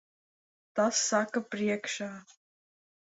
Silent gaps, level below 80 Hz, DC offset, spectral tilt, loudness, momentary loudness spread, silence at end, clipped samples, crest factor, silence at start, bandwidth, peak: none; -78 dBFS; under 0.1%; -2.5 dB/octave; -30 LUFS; 12 LU; 0.85 s; under 0.1%; 20 dB; 0.75 s; 8.4 kHz; -14 dBFS